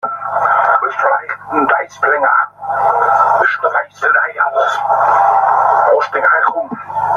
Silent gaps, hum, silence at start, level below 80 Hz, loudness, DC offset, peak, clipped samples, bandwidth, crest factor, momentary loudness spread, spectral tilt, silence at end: none; 50 Hz at -50 dBFS; 0.05 s; -60 dBFS; -13 LUFS; under 0.1%; 0 dBFS; under 0.1%; 9.6 kHz; 14 dB; 6 LU; -4.5 dB/octave; 0 s